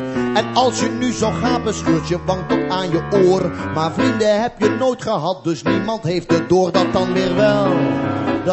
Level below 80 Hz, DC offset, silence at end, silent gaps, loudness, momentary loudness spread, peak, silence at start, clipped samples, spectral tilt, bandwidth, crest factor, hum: -42 dBFS; under 0.1%; 0 s; none; -18 LUFS; 6 LU; -2 dBFS; 0 s; under 0.1%; -5.5 dB/octave; 8.4 kHz; 16 dB; none